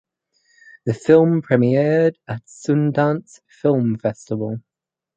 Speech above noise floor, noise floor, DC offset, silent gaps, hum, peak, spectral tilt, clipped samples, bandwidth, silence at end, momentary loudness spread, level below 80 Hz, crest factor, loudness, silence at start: 46 dB; -64 dBFS; under 0.1%; none; none; -2 dBFS; -8 dB/octave; under 0.1%; 9 kHz; 0.6 s; 14 LU; -60 dBFS; 18 dB; -19 LUFS; 0.85 s